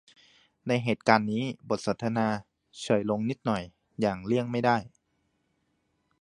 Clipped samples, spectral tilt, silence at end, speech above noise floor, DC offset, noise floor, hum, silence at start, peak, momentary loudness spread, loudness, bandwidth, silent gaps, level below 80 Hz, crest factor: under 0.1%; -6 dB/octave; 1.35 s; 47 dB; under 0.1%; -75 dBFS; none; 0.65 s; -2 dBFS; 9 LU; -28 LUFS; 11.5 kHz; none; -62 dBFS; 26 dB